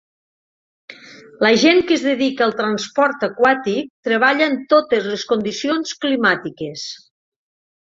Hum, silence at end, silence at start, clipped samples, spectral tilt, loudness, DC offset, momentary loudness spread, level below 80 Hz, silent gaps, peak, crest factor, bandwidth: none; 0.95 s; 0.9 s; under 0.1%; -4 dB/octave; -17 LUFS; under 0.1%; 11 LU; -62 dBFS; 3.90-4.03 s; -2 dBFS; 18 dB; 7.8 kHz